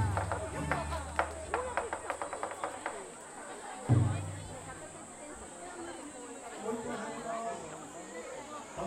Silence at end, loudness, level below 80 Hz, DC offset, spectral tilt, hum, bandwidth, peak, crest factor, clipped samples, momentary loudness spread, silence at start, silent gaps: 0 s; -38 LUFS; -52 dBFS; under 0.1%; -5.5 dB/octave; none; 14 kHz; -12 dBFS; 26 dB; under 0.1%; 12 LU; 0 s; none